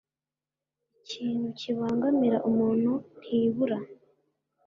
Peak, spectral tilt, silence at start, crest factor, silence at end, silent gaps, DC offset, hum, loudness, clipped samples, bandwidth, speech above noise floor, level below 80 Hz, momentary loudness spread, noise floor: -14 dBFS; -7.5 dB/octave; 1.1 s; 16 dB; 0.7 s; none; under 0.1%; none; -28 LUFS; under 0.1%; 7.4 kHz; over 63 dB; -70 dBFS; 10 LU; under -90 dBFS